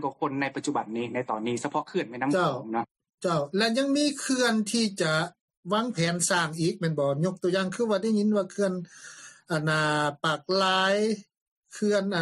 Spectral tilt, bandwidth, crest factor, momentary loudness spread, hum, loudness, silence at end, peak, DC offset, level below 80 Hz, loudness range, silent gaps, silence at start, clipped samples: -4.5 dB/octave; 13 kHz; 16 dB; 8 LU; none; -27 LUFS; 0 s; -12 dBFS; under 0.1%; -72 dBFS; 2 LU; 2.91-2.95 s, 3.14-3.18 s, 5.41-5.48 s, 5.57-5.63 s, 11.37-11.62 s; 0 s; under 0.1%